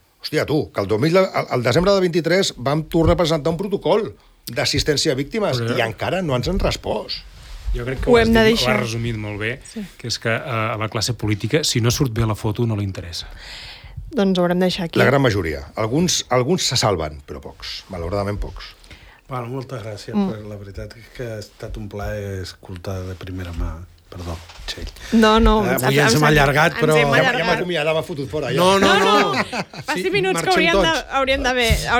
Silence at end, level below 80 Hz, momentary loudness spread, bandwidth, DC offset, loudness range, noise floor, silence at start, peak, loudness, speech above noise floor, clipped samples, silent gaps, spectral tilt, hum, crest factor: 0 s; -34 dBFS; 18 LU; over 20 kHz; under 0.1%; 13 LU; -44 dBFS; 0.25 s; -2 dBFS; -19 LUFS; 25 dB; under 0.1%; none; -4.5 dB/octave; none; 16 dB